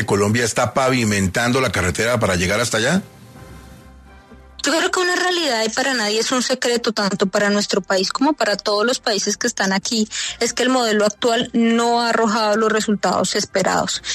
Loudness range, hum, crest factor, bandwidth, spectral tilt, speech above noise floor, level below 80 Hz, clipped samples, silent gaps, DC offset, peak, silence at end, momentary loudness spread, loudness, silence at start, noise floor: 3 LU; none; 14 dB; 13.5 kHz; -3.5 dB/octave; 25 dB; -48 dBFS; under 0.1%; none; under 0.1%; -4 dBFS; 0 s; 3 LU; -18 LUFS; 0 s; -43 dBFS